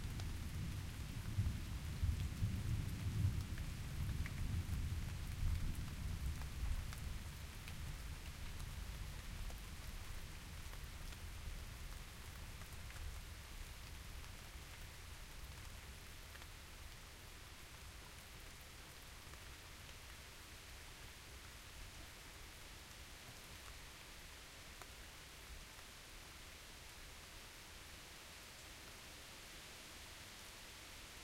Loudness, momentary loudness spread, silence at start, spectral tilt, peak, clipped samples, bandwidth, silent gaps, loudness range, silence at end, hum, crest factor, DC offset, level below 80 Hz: -50 LUFS; 11 LU; 0 s; -4.5 dB/octave; -26 dBFS; under 0.1%; 16 kHz; none; 11 LU; 0 s; none; 20 dB; under 0.1%; -50 dBFS